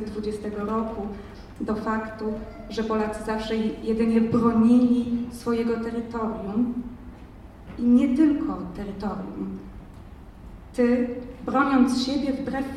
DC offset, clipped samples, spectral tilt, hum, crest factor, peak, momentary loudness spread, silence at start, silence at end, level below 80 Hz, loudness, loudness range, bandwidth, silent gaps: under 0.1%; under 0.1%; -6.5 dB/octave; none; 18 dB; -8 dBFS; 22 LU; 0 s; 0 s; -46 dBFS; -25 LUFS; 6 LU; 12 kHz; none